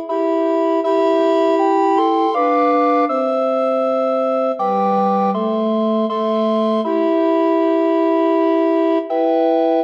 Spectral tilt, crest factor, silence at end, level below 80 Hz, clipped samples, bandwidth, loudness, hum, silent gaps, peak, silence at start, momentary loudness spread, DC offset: -7.5 dB/octave; 10 dB; 0 s; -70 dBFS; under 0.1%; 7.4 kHz; -16 LUFS; none; none; -6 dBFS; 0 s; 3 LU; under 0.1%